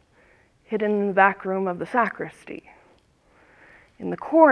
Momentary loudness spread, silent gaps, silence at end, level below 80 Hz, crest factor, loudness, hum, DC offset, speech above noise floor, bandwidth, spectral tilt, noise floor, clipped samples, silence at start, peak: 19 LU; none; 0 s; -66 dBFS; 22 dB; -23 LUFS; none; under 0.1%; 38 dB; 11 kHz; -8 dB/octave; -59 dBFS; under 0.1%; 0.7 s; -2 dBFS